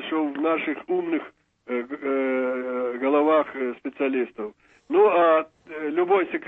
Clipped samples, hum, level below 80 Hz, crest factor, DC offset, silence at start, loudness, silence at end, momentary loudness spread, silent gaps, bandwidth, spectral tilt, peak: under 0.1%; none; -72 dBFS; 16 dB; under 0.1%; 0 s; -24 LUFS; 0 s; 12 LU; none; 3.9 kHz; -7.5 dB/octave; -8 dBFS